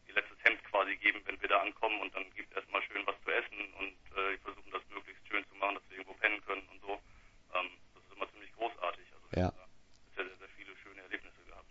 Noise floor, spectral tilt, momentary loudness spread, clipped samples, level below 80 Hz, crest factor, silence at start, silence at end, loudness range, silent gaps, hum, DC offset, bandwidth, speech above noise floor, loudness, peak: -60 dBFS; -2 dB/octave; 16 LU; under 0.1%; -62 dBFS; 30 dB; 0.1 s; 0.1 s; 8 LU; none; none; under 0.1%; 7.6 kHz; 23 dB; -36 LUFS; -8 dBFS